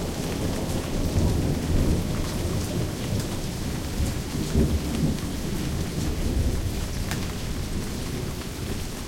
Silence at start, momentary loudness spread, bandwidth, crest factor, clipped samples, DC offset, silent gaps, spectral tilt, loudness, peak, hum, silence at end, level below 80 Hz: 0 s; 6 LU; 17 kHz; 18 dB; under 0.1%; under 0.1%; none; -5.5 dB/octave; -28 LUFS; -8 dBFS; none; 0 s; -32 dBFS